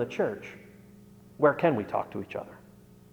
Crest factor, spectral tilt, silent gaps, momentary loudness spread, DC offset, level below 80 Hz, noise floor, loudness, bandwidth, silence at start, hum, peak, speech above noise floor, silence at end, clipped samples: 22 dB; -7.5 dB/octave; none; 22 LU; under 0.1%; -66 dBFS; -53 dBFS; -29 LUFS; over 20 kHz; 0 s; 60 Hz at -55 dBFS; -8 dBFS; 24 dB; 0.55 s; under 0.1%